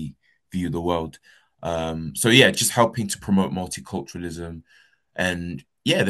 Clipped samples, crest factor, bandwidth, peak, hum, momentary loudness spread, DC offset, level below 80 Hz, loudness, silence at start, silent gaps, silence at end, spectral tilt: under 0.1%; 24 dB; 13 kHz; 0 dBFS; none; 19 LU; under 0.1%; -50 dBFS; -22 LUFS; 0 s; none; 0 s; -4 dB/octave